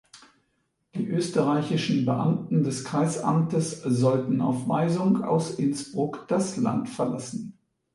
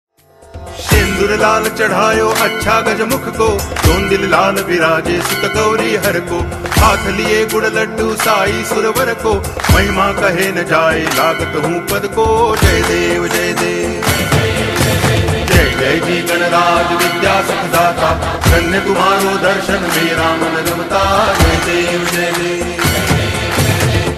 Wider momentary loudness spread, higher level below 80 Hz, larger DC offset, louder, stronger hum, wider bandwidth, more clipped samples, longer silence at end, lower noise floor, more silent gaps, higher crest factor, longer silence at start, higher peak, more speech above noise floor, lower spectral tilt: first, 7 LU vs 4 LU; second, -66 dBFS vs -26 dBFS; neither; second, -26 LUFS vs -13 LUFS; neither; second, 11.5 kHz vs 14.5 kHz; neither; first, 0.45 s vs 0 s; first, -73 dBFS vs -37 dBFS; neither; about the same, 16 dB vs 14 dB; second, 0.15 s vs 0.55 s; second, -10 dBFS vs 0 dBFS; first, 49 dB vs 24 dB; first, -6.5 dB/octave vs -4.5 dB/octave